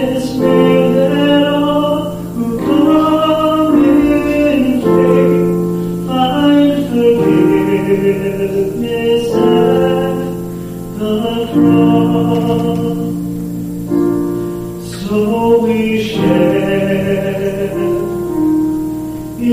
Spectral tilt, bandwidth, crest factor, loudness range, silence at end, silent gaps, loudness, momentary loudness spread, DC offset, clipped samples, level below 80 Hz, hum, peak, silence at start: -7 dB/octave; 15.5 kHz; 12 dB; 4 LU; 0 s; none; -13 LUFS; 10 LU; under 0.1%; under 0.1%; -38 dBFS; none; 0 dBFS; 0 s